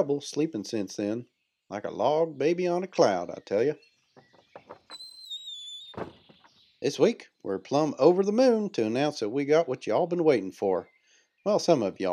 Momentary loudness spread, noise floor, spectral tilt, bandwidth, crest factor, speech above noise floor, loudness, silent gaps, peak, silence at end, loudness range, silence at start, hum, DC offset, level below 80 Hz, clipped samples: 16 LU; -66 dBFS; -5.5 dB/octave; 12 kHz; 20 dB; 40 dB; -27 LUFS; none; -8 dBFS; 0 s; 9 LU; 0 s; none; under 0.1%; -76 dBFS; under 0.1%